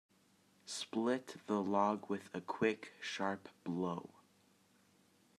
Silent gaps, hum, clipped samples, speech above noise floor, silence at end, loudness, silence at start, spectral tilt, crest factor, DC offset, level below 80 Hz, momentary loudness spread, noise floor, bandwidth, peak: none; none; under 0.1%; 33 dB; 1.3 s; -39 LUFS; 0.65 s; -5 dB/octave; 22 dB; under 0.1%; -88 dBFS; 11 LU; -71 dBFS; 13.5 kHz; -20 dBFS